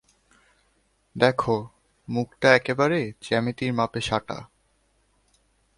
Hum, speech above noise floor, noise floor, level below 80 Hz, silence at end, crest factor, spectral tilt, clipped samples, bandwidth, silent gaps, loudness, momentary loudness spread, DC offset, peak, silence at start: none; 44 dB; -67 dBFS; -56 dBFS; 1.3 s; 24 dB; -5.5 dB/octave; under 0.1%; 11.5 kHz; none; -24 LUFS; 16 LU; under 0.1%; -2 dBFS; 1.15 s